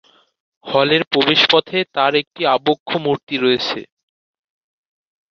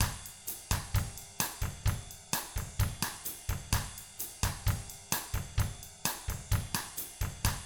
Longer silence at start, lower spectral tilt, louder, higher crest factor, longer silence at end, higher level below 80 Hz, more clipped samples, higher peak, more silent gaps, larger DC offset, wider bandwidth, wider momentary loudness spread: first, 0.65 s vs 0 s; first, -5 dB/octave vs -3 dB/octave; first, -16 LUFS vs -36 LUFS; about the same, 18 dB vs 22 dB; first, 1.5 s vs 0 s; second, -64 dBFS vs -42 dBFS; neither; first, -2 dBFS vs -12 dBFS; first, 1.07-1.11 s, 2.27-2.31 s, 2.80-2.86 s, 3.23-3.27 s vs none; neither; second, 7.2 kHz vs over 20 kHz; about the same, 8 LU vs 7 LU